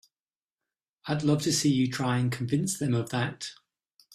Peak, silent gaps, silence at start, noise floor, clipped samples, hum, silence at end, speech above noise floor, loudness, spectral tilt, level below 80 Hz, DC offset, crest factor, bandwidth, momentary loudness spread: -12 dBFS; none; 1.05 s; under -90 dBFS; under 0.1%; none; 0.6 s; over 63 dB; -27 LUFS; -5 dB/octave; -64 dBFS; under 0.1%; 16 dB; 15.5 kHz; 11 LU